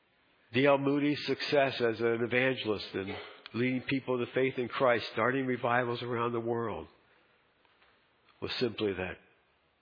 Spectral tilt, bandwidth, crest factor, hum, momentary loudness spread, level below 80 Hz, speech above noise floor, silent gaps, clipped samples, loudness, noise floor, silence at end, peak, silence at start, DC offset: -7 dB/octave; 5.2 kHz; 22 dB; none; 11 LU; -70 dBFS; 39 dB; none; under 0.1%; -31 LUFS; -70 dBFS; 0.65 s; -12 dBFS; 0.5 s; under 0.1%